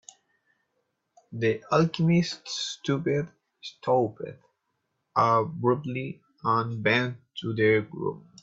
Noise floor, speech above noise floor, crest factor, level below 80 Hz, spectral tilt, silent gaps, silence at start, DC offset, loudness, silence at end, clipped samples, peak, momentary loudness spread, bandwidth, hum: -78 dBFS; 52 dB; 20 dB; -66 dBFS; -6 dB/octave; none; 1.3 s; under 0.1%; -26 LUFS; 0.25 s; under 0.1%; -8 dBFS; 14 LU; 7.8 kHz; none